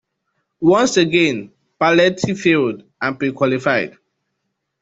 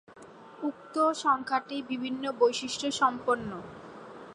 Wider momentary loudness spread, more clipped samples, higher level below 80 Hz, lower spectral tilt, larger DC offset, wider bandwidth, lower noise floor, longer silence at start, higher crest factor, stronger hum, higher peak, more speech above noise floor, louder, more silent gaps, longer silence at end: second, 10 LU vs 19 LU; neither; first, -58 dBFS vs -68 dBFS; first, -5 dB/octave vs -3.5 dB/octave; neither; second, 8 kHz vs 11.5 kHz; first, -74 dBFS vs -50 dBFS; first, 0.6 s vs 0.1 s; about the same, 18 dB vs 20 dB; neither; first, 0 dBFS vs -12 dBFS; first, 58 dB vs 21 dB; first, -17 LUFS vs -29 LUFS; neither; first, 0.9 s vs 0 s